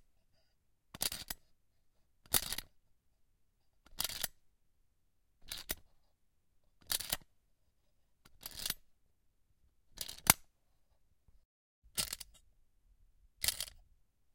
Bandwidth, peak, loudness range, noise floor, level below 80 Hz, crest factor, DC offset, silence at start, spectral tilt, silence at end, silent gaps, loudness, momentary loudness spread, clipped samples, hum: 17 kHz; 0 dBFS; 8 LU; -78 dBFS; -62 dBFS; 44 dB; under 0.1%; 0.95 s; -0.5 dB/octave; 0.55 s; 11.45-11.82 s; -37 LUFS; 15 LU; under 0.1%; none